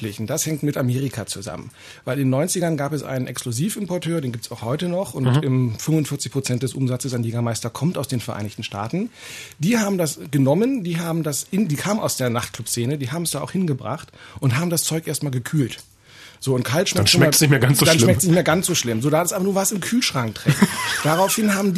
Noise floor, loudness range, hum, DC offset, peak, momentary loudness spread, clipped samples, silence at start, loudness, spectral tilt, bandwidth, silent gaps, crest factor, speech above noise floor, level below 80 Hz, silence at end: -46 dBFS; 7 LU; none; under 0.1%; -2 dBFS; 12 LU; under 0.1%; 0 s; -21 LUFS; -4.5 dB/octave; 14 kHz; none; 18 dB; 25 dB; -56 dBFS; 0 s